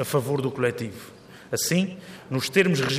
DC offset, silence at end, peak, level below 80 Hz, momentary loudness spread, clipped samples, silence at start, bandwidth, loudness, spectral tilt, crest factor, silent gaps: under 0.1%; 0 s; -4 dBFS; -64 dBFS; 18 LU; under 0.1%; 0 s; 15.5 kHz; -25 LUFS; -4.5 dB/octave; 20 dB; none